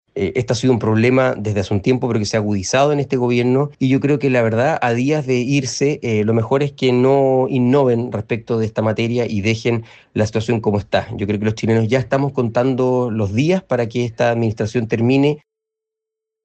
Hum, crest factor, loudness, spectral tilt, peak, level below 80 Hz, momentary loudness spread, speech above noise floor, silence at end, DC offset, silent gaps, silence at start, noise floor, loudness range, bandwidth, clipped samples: none; 14 dB; -17 LUFS; -6.5 dB/octave; -4 dBFS; -52 dBFS; 6 LU; 67 dB; 1.05 s; under 0.1%; none; 0.15 s; -83 dBFS; 3 LU; 8.6 kHz; under 0.1%